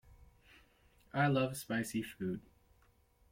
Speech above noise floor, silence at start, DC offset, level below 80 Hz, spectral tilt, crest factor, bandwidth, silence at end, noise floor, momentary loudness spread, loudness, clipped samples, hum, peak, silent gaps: 34 dB; 0.1 s; under 0.1%; -66 dBFS; -6 dB/octave; 18 dB; 16.5 kHz; 0.9 s; -70 dBFS; 10 LU; -37 LUFS; under 0.1%; none; -22 dBFS; none